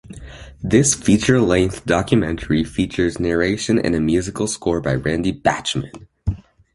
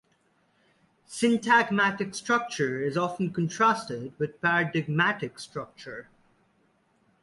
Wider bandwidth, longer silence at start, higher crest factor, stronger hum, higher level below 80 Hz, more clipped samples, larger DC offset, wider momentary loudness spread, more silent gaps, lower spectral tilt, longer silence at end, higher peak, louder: about the same, 11.5 kHz vs 11.5 kHz; second, 0.1 s vs 1.1 s; about the same, 18 dB vs 20 dB; neither; first, -36 dBFS vs -68 dBFS; neither; neither; second, 13 LU vs 17 LU; neither; about the same, -5 dB/octave vs -5 dB/octave; second, 0.4 s vs 1.2 s; first, 0 dBFS vs -10 dBFS; first, -19 LUFS vs -26 LUFS